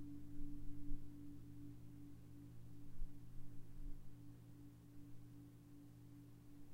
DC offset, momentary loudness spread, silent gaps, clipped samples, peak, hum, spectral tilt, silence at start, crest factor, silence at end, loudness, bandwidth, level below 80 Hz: under 0.1%; 7 LU; none; under 0.1%; -30 dBFS; none; -7.5 dB/octave; 0 s; 18 dB; 0 s; -59 LUFS; 3.8 kHz; -54 dBFS